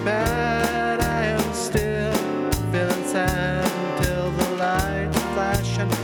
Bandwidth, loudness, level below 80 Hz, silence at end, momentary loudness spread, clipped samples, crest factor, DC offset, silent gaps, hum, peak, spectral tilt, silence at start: over 20 kHz; -23 LUFS; -36 dBFS; 0 s; 2 LU; under 0.1%; 18 dB; under 0.1%; none; none; -4 dBFS; -5 dB/octave; 0 s